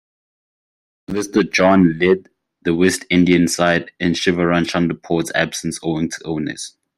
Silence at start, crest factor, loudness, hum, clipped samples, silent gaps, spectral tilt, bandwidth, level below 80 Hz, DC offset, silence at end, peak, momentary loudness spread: 1.1 s; 16 dB; -17 LUFS; none; under 0.1%; none; -5 dB/octave; 15 kHz; -52 dBFS; under 0.1%; 0.3 s; -2 dBFS; 10 LU